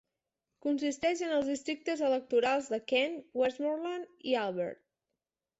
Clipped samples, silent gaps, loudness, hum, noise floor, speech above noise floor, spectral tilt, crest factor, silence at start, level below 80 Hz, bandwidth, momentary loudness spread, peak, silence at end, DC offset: under 0.1%; none; -32 LUFS; none; -89 dBFS; 57 dB; -3.5 dB/octave; 18 dB; 0.65 s; -74 dBFS; 8.2 kHz; 8 LU; -16 dBFS; 0.85 s; under 0.1%